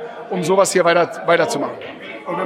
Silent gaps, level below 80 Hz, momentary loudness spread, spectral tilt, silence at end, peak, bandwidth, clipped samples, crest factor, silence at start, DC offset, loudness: none; -70 dBFS; 17 LU; -4 dB/octave; 0 s; -2 dBFS; 15.5 kHz; under 0.1%; 16 dB; 0 s; under 0.1%; -17 LUFS